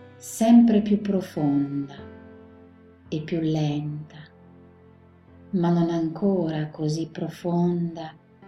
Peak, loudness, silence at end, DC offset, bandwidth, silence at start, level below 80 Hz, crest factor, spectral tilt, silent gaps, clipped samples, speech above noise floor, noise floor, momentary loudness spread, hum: -6 dBFS; -24 LUFS; 0 s; under 0.1%; 14 kHz; 0 s; -62 dBFS; 18 dB; -7.5 dB/octave; none; under 0.1%; 29 dB; -52 dBFS; 19 LU; none